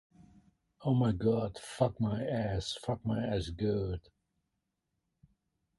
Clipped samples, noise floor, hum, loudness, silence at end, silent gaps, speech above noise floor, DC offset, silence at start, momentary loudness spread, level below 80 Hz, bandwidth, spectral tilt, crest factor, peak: under 0.1%; -84 dBFS; none; -34 LUFS; 1.8 s; none; 52 dB; under 0.1%; 0.2 s; 8 LU; -52 dBFS; 11.5 kHz; -7 dB/octave; 20 dB; -14 dBFS